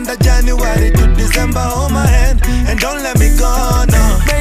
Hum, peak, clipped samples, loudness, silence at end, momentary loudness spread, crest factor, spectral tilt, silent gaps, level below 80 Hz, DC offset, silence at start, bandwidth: none; 0 dBFS; under 0.1%; -13 LUFS; 0 s; 3 LU; 10 dB; -5 dB/octave; none; -12 dBFS; under 0.1%; 0 s; 15.5 kHz